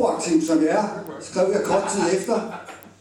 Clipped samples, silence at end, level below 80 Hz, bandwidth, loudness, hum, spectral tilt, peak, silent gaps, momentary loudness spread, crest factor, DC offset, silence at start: under 0.1%; 0.1 s; -60 dBFS; 16 kHz; -22 LUFS; none; -4.5 dB/octave; -8 dBFS; none; 14 LU; 14 dB; under 0.1%; 0 s